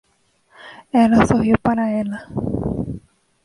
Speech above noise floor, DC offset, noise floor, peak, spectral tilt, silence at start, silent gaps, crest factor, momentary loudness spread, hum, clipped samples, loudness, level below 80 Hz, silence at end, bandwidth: 44 dB; under 0.1%; -61 dBFS; -2 dBFS; -7.5 dB/octave; 0.65 s; none; 18 dB; 13 LU; none; under 0.1%; -18 LUFS; -40 dBFS; 0.45 s; 11 kHz